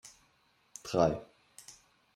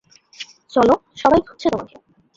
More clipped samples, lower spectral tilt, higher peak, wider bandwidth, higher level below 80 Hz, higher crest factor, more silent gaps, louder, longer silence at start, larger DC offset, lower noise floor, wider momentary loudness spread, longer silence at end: neither; about the same, -5.5 dB/octave vs -6 dB/octave; second, -12 dBFS vs -2 dBFS; first, 16 kHz vs 7.8 kHz; second, -62 dBFS vs -48 dBFS; first, 24 dB vs 18 dB; neither; second, -32 LUFS vs -18 LUFS; second, 0.05 s vs 0.4 s; neither; first, -70 dBFS vs -40 dBFS; first, 25 LU vs 20 LU; about the same, 0.45 s vs 0.5 s